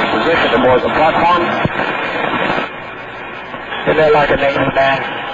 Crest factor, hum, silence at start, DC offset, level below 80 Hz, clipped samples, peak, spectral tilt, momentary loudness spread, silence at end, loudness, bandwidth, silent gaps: 12 dB; none; 0 s; under 0.1%; -40 dBFS; under 0.1%; -2 dBFS; -6 dB/octave; 15 LU; 0 s; -13 LUFS; 7.6 kHz; none